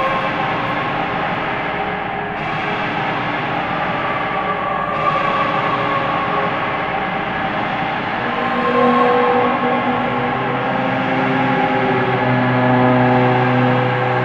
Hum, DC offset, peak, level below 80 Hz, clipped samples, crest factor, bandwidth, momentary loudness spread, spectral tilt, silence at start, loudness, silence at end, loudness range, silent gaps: none; under 0.1%; -2 dBFS; -46 dBFS; under 0.1%; 14 dB; 7.4 kHz; 6 LU; -7.5 dB/octave; 0 s; -17 LUFS; 0 s; 5 LU; none